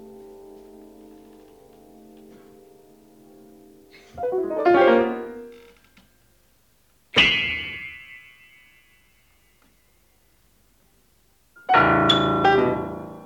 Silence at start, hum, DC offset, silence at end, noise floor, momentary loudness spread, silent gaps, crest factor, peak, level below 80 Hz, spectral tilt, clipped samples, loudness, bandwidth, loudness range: 0 s; none; under 0.1%; 0 s; -63 dBFS; 28 LU; none; 20 dB; -4 dBFS; -52 dBFS; -5 dB/octave; under 0.1%; -20 LUFS; 18.5 kHz; 12 LU